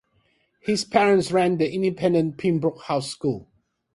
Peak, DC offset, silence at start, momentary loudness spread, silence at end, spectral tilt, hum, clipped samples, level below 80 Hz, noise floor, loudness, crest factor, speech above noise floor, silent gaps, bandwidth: -6 dBFS; under 0.1%; 0.65 s; 9 LU; 0.5 s; -6 dB/octave; none; under 0.1%; -60 dBFS; -66 dBFS; -22 LUFS; 18 dB; 44 dB; none; 11.5 kHz